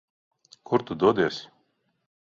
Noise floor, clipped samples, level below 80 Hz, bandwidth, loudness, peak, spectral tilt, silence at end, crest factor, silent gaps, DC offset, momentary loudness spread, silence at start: -72 dBFS; under 0.1%; -62 dBFS; 7.4 kHz; -25 LUFS; -6 dBFS; -6.5 dB/octave; 0.85 s; 22 dB; none; under 0.1%; 7 LU; 0.7 s